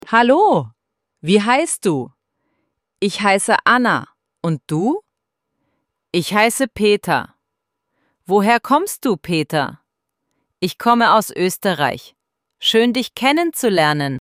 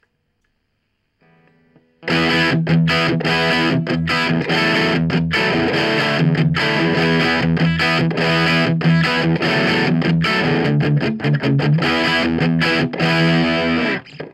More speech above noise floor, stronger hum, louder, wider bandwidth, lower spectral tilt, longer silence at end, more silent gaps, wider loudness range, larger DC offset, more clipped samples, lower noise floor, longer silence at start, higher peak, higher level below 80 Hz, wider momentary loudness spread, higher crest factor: first, 61 dB vs 52 dB; neither; about the same, -17 LUFS vs -16 LUFS; first, 16 kHz vs 12 kHz; second, -4 dB/octave vs -6 dB/octave; about the same, 0 s vs 0.05 s; neither; about the same, 3 LU vs 2 LU; neither; neither; first, -78 dBFS vs -69 dBFS; second, 0.05 s vs 2 s; about the same, -2 dBFS vs -4 dBFS; second, -58 dBFS vs -46 dBFS; first, 11 LU vs 3 LU; about the same, 16 dB vs 14 dB